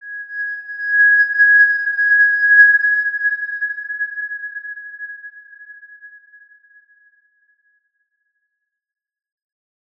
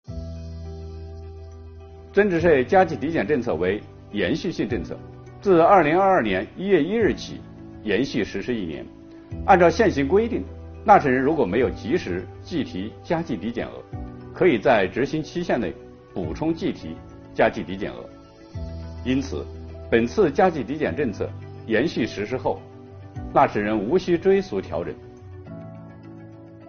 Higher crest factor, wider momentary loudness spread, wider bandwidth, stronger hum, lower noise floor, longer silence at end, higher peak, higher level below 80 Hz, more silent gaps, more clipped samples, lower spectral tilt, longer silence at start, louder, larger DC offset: about the same, 18 dB vs 22 dB; about the same, 21 LU vs 22 LU; second, 5.2 kHz vs 6.8 kHz; neither; first, -76 dBFS vs -42 dBFS; first, 3.9 s vs 0 s; about the same, -2 dBFS vs -2 dBFS; second, -86 dBFS vs -44 dBFS; neither; neither; second, 2 dB/octave vs -5 dB/octave; about the same, 0.05 s vs 0.1 s; first, -13 LUFS vs -22 LUFS; neither